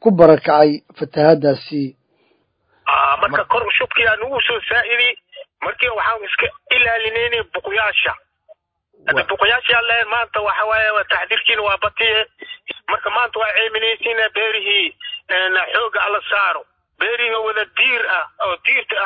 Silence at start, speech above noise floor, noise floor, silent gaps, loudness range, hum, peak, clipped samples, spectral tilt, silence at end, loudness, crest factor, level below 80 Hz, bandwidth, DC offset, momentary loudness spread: 0 s; 45 dB; -62 dBFS; none; 2 LU; none; 0 dBFS; under 0.1%; -7.5 dB/octave; 0 s; -16 LUFS; 18 dB; -52 dBFS; 5.2 kHz; under 0.1%; 9 LU